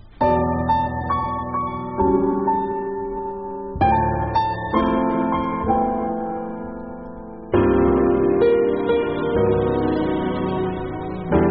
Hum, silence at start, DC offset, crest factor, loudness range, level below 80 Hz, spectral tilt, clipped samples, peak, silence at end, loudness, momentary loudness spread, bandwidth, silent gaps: none; 0.05 s; 0.3%; 16 dB; 3 LU; -36 dBFS; -6.5 dB/octave; under 0.1%; -4 dBFS; 0 s; -21 LUFS; 12 LU; 5.8 kHz; none